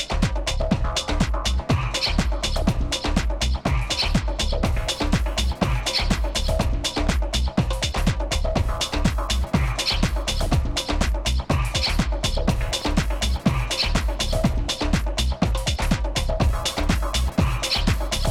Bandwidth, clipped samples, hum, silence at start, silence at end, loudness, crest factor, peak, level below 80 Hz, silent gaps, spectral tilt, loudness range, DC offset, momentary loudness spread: 15.5 kHz; under 0.1%; none; 0 s; 0 s; -23 LUFS; 16 dB; -6 dBFS; -24 dBFS; none; -4.5 dB/octave; 0 LU; under 0.1%; 3 LU